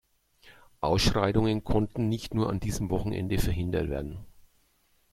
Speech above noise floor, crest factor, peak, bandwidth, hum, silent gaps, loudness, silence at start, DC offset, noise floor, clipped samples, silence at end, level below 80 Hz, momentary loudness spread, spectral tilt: 40 dB; 18 dB; -10 dBFS; 15.5 kHz; none; none; -29 LUFS; 0.45 s; under 0.1%; -68 dBFS; under 0.1%; 0.85 s; -40 dBFS; 9 LU; -6 dB/octave